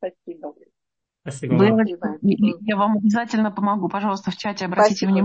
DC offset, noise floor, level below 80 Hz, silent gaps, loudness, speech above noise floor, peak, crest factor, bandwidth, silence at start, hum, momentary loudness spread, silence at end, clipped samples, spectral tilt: under 0.1%; -83 dBFS; -64 dBFS; none; -20 LUFS; 64 dB; -4 dBFS; 16 dB; 8.8 kHz; 0 s; none; 19 LU; 0 s; under 0.1%; -6.5 dB/octave